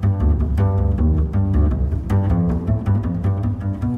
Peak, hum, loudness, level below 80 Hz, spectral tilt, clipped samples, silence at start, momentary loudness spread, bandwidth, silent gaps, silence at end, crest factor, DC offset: -6 dBFS; none; -20 LUFS; -22 dBFS; -10.5 dB/octave; under 0.1%; 0 s; 4 LU; 3.3 kHz; none; 0 s; 12 dB; under 0.1%